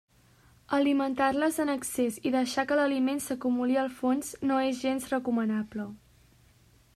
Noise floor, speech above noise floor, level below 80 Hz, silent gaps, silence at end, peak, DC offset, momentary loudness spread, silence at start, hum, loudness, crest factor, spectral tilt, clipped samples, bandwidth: -61 dBFS; 33 dB; -64 dBFS; none; 1 s; -14 dBFS; under 0.1%; 5 LU; 0.7 s; none; -29 LUFS; 16 dB; -4 dB/octave; under 0.1%; 15 kHz